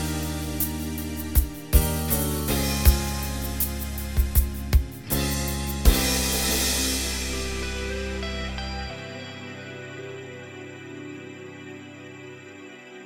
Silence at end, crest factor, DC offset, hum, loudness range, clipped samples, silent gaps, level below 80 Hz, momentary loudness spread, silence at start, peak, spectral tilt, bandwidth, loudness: 0 s; 24 dB; under 0.1%; none; 14 LU; under 0.1%; none; -28 dBFS; 18 LU; 0 s; -2 dBFS; -4 dB/octave; 18.5 kHz; -25 LUFS